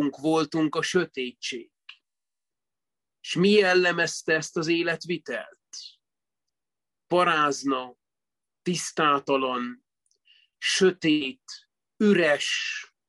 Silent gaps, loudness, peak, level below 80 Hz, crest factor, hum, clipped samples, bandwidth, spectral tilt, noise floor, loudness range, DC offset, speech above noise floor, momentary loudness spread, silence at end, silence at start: none; -25 LUFS; -8 dBFS; -74 dBFS; 18 dB; none; under 0.1%; 12 kHz; -4 dB/octave; under -90 dBFS; 4 LU; under 0.1%; over 65 dB; 19 LU; 0.25 s; 0 s